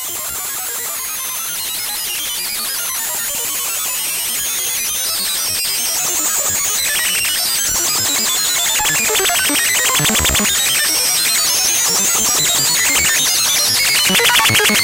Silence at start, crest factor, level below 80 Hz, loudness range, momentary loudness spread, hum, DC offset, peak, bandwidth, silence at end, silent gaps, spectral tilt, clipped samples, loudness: 0 s; 16 dB; -42 dBFS; 6 LU; 8 LU; none; under 0.1%; 0 dBFS; 16 kHz; 0 s; none; 0 dB/octave; under 0.1%; -13 LUFS